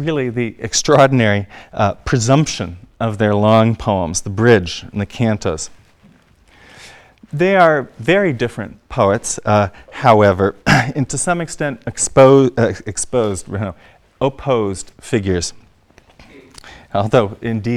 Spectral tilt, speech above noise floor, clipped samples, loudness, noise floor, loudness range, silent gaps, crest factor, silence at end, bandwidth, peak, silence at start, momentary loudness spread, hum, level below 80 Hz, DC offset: -5 dB/octave; 35 dB; 0.1%; -16 LUFS; -50 dBFS; 7 LU; none; 16 dB; 0 s; 13 kHz; 0 dBFS; 0 s; 13 LU; none; -42 dBFS; under 0.1%